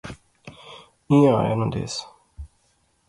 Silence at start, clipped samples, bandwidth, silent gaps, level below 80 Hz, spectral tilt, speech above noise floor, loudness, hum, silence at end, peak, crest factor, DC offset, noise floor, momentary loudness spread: 0.05 s; under 0.1%; 11.5 kHz; none; -48 dBFS; -7 dB/octave; 46 dB; -21 LUFS; none; 0.6 s; -6 dBFS; 18 dB; under 0.1%; -65 dBFS; 27 LU